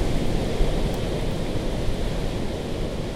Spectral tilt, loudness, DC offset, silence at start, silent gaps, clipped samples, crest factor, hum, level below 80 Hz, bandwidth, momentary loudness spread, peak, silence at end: -6 dB/octave; -27 LUFS; under 0.1%; 0 s; none; under 0.1%; 16 dB; none; -28 dBFS; 15.5 kHz; 4 LU; -8 dBFS; 0 s